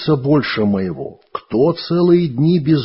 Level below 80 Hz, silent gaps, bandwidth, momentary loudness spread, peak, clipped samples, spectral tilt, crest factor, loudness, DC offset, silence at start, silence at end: -50 dBFS; none; 5.8 kHz; 13 LU; -2 dBFS; under 0.1%; -11.5 dB/octave; 14 dB; -16 LUFS; under 0.1%; 0 s; 0 s